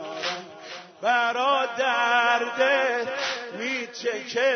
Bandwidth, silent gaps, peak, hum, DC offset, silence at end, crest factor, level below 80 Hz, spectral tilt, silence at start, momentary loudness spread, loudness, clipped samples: 6.6 kHz; none; -8 dBFS; none; under 0.1%; 0 s; 16 dB; -84 dBFS; -1.5 dB/octave; 0 s; 10 LU; -24 LUFS; under 0.1%